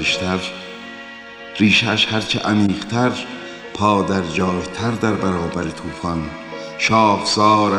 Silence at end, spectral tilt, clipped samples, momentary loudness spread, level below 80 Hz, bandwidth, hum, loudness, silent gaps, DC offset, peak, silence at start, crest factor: 0 s; -4.5 dB/octave; under 0.1%; 17 LU; -46 dBFS; 11.5 kHz; none; -18 LUFS; none; under 0.1%; -2 dBFS; 0 s; 16 dB